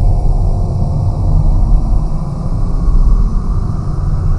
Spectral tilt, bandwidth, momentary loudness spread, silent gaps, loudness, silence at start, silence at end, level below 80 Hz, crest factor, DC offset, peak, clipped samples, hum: -9.5 dB/octave; 5.8 kHz; 4 LU; none; -16 LUFS; 0 s; 0 s; -12 dBFS; 10 dB; under 0.1%; 0 dBFS; under 0.1%; none